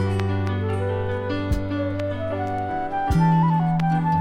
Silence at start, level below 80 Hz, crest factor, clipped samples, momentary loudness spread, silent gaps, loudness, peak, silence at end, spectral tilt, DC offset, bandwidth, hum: 0 s; -36 dBFS; 14 dB; under 0.1%; 7 LU; none; -23 LUFS; -8 dBFS; 0 s; -8.5 dB/octave; under 0.1%; 9.6 kHz; none